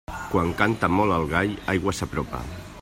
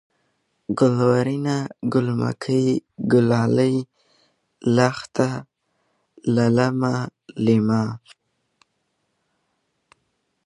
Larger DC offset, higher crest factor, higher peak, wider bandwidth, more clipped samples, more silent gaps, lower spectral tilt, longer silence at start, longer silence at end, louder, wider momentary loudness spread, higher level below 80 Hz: neither; about the same, 20 dB vs 22 dB; second, -6 dBFS vs -2 dBFS; first, 16 kHz vs 11 kHz; neither; neither; second, -6 dB/octave vs -7.5 dB/octave; second, 0.1 s vs 0.7 s; second, 0 s vs 2.5 s; second, -24 LUFS vs -21 LUFS; about the same, 10 LU vs 11 LU; first, -42 dBFS vs -60 dBFS